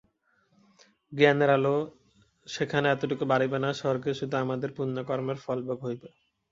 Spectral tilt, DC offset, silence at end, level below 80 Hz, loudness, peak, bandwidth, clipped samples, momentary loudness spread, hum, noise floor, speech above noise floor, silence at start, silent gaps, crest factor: -6.5 dB/octave; under 0.1%; 0.45 s; -68 dBFS; -28 LUFS; -6 dBFS; 7.6 kHz; under 0.1%; 12 LU; none; -70 dBFS; 42 dB; 1.1 s; none; 22 dB